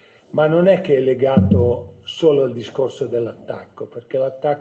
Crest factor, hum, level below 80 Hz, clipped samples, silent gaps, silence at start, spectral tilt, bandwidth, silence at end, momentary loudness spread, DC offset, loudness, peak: 16 dB; none; -48 dBFS; under 0.1%; none; 0.35 s; -8 dB/octave; 8 kHz; 0 s; 16 LU; under 0.1%; -16 LUFS; 0 dBFS